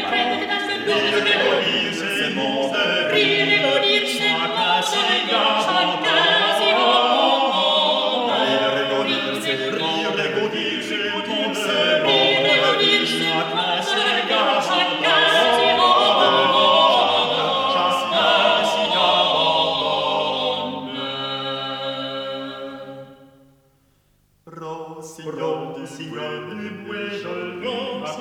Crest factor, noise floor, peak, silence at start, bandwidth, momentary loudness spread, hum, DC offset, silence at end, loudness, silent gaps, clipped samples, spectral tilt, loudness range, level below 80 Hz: 16 dB; -61 dBFS; -4 dBFS; 0 s; 17.5 kHz; 14 LU; none; under 0.1%; 0 s; -18 LUFS; none; under 0.1%; -3 dB/octave; 15 LU; -66 dBFS